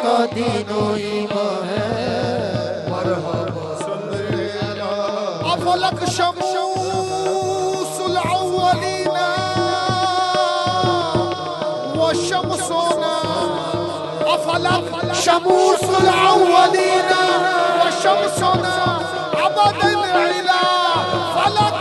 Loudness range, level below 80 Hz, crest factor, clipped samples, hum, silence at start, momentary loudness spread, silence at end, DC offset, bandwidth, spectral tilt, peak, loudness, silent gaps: 7 LU; -52 dBFS; 18 dB; under 0.1%; none; 0 s; 8 LU; 0 s; under 0.1%; 12 kHz; -4 dB/octave; 0 dBFS; -18 LUFS; none